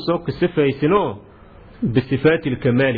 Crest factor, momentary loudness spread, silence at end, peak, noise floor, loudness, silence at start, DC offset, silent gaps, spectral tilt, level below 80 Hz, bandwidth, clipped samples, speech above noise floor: 16 dB; 8 LU; 0 s; -4 dBFS; -43 dBFS; -19 LUFS; 0 s; under 0.1%; none; -10.5 dB/octave; -46 dBFS; 4.9 kHz; under 0.1%; 26 dB